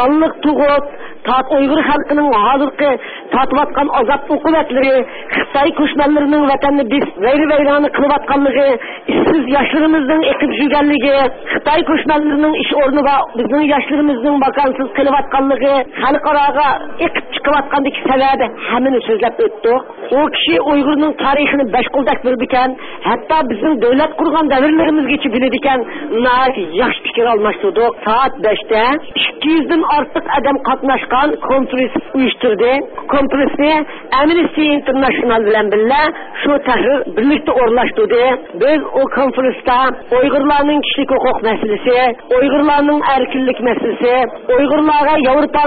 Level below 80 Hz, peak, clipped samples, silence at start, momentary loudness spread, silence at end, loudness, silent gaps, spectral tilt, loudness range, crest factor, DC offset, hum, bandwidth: -42 dBFS; -2 dBFS; under 0.1%; 0 s; 4 LU; 0 s; -13 LUFS; none; -10 dB/octave; 1 LU; 10 dB; under 0.1%; none; 4.8 kHz